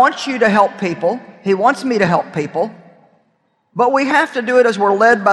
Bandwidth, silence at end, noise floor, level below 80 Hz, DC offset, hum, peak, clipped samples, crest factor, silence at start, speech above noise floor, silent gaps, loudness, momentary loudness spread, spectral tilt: 12 kHz; 0 s; -62 dBFS; -60 dBFS; under 0.1%; none; 0 dBFS; under 0.1%; 14 dB; 0 s; 48 dB; none; -15 LUFS; 9 LU; -5.5 dB/octave